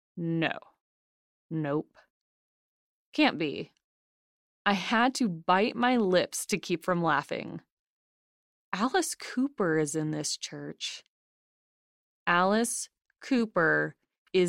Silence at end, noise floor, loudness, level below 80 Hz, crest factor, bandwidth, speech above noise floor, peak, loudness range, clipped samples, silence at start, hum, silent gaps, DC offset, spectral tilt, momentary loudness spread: 0 s; under -90 dBFS; -29 LUFS; -74 dBFS; 20 dB; 16 kHz; over 62 dB; -10 dBFS; 6 LU; under 0.1%; 0.15 s; none; 0.81-1.50 s, 2.10-3.12 s, 3.84-4.65 s, 7.72-8.72 s, 11.08-12.26 s, 14.18-14.26 s; under 0.1%; -4 dB/octave; 13 LU